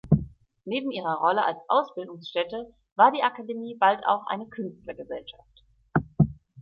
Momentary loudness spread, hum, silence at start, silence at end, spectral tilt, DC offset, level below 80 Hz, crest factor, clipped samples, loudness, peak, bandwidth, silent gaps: 17 LU; none; 0.05 s; 0 s; -9 dB/octave; under 0.1%; -50 dBFS; 22 dB; under 0.1%; -26 LUFS; -6 dBFS; 5.6 kHz; 2.92-2.96 s